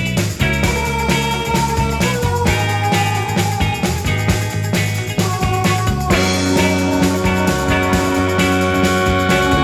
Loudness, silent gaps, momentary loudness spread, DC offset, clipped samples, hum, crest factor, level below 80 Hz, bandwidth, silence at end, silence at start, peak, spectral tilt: -16 LUFS; none; 3 LU; under 0.1%; under 0.1%; none; 14 dB; -28 dBFS; 18 kHz; 0 s; 0 s; -2 dBFS; -5 dB/octave